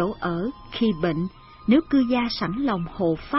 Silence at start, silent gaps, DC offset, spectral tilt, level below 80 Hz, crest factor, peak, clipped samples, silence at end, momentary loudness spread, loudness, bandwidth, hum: 0 s; none; under 0.1%; -9.5 dB/octave; -46 dBFS; 16 dB; -6 dBFS; under 0.1%; 0 s; 9 LU; -24 LUFS; 6 kHz; none